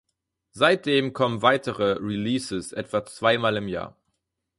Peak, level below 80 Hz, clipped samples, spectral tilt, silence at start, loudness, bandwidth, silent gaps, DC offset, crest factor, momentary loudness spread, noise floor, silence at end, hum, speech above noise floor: -4 dBFS; -58 dBFS; under 0.1%; -5 dB/octave; 0.55 s; -24 LUFS; 11.5 kHz; none; under 0.1%; 20 dB; 10 LU; -78 dBFS; 0.7 s; none; 54 dB